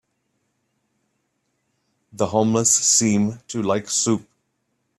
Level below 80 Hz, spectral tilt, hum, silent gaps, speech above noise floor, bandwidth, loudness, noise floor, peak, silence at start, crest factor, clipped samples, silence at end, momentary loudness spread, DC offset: -62 dBFS; -3.5 dB/octave; none; none; 53 dB; 14.5 kHz; -19 LUFS; -72 dBFS; -4 dBFS; 2.15 s; 20 dB; under 0.1%; 0.8 s; 11 LU; under 0.1%